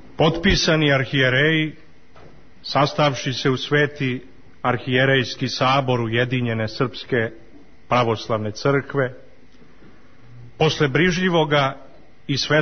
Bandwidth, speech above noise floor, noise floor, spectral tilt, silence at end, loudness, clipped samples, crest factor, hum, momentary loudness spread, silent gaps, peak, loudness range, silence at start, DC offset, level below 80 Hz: 6.6 kHz; 31 dB; -51 dBFS; -5.5 dB/octave; 0 s; -20 LUFS; under 0.1%; 16 dB; none; 9 LU; none; -4 dBFS; 4 LU; 0.2 s; 0.8%; -42 dBFS